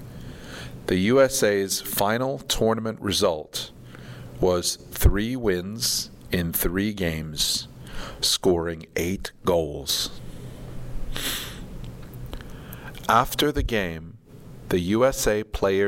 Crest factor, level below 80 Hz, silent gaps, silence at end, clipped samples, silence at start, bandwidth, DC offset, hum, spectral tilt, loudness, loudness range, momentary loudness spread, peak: 20 dB; -36 dBFS; none; 0 s; under 0.1%; 0 s; 16.5 kHz; under 0.1%; none; -4 dB/octave; -24 LUFS; 6 LU; 19 LU; -4 dBFS